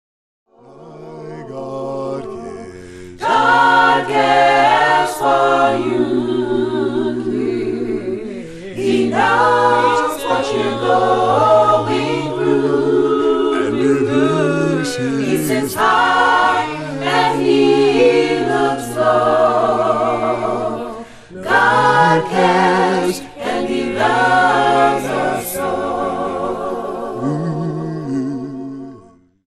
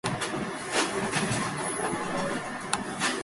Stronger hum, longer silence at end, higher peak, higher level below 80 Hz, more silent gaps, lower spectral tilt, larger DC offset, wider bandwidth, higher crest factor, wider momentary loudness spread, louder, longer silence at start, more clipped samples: neither; first, 0.5 s vs 0 s; first, 0 dBFS vs -6 dBFS; first, -50 dBFS vs -56 dBFS; neither; first, -5 dB/octave vs -3.5 dB/octave; neither; about the same, 13 kHz vs 12 kHz; second, 14 dB vs 24 dB; first, 14 LU vs 4 LU; first, -15 LUFS vs -29 LUFS; first, 0.75 s vs 0.05 s; neither